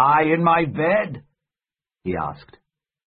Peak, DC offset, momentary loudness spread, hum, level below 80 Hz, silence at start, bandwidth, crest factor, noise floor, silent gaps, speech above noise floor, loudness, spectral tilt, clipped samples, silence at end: -4 dBFS; under 0.1%; 15 LU; none; -52 dBFS; 0 s; 5 kHz; 18 dB; under -90 dBFS; none; over 70 dB; -20 LUFS; -11.5 dB/octave; under 0.1%; 0.7 s